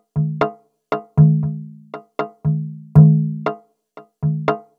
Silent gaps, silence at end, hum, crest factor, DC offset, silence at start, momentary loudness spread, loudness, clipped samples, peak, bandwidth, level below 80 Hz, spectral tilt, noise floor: none; 0.2 s; none; 18 dB; under 0.1%; 0.15 s; 19 LU; -18 LUFS; under 0.1%; 0 dBFS; 4.4 kHz; -48 dBFS; -11 dB/octave; -45 dBFS